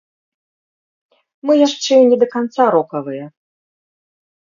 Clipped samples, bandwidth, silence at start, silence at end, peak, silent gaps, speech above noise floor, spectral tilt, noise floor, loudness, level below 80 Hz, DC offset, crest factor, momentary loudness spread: under 0.1%; 7.4 kHz; 1.45 s; 1.3 s; 0 dBFS; none; over 76 dB; -4.5 dB/octave; under -90 dBFS; -14 LUFS; -74 dBFS; under 0.1%; 18 dB; 15 LU